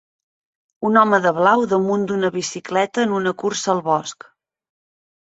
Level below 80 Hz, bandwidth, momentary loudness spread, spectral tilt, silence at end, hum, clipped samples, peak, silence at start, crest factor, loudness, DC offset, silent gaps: -64 dBFS; 8.2 kHz; 7 LU; -4.5 dB/octave; 1.25 s; none; under 0.1%; -2 dBFS; 0.8 s; 20 dB; -19 LUFS; under 0.1%; none